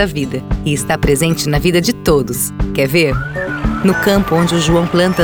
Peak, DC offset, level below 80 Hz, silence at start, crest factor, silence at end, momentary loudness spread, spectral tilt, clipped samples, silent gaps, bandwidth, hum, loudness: -2 dBFS; under 0.1%; -26 dBFS; 0 s; 12 dB; 0 s; 6 LU; -5 dB/octave; under 0.1%; none; over 20 kHz; none; -14 LUFS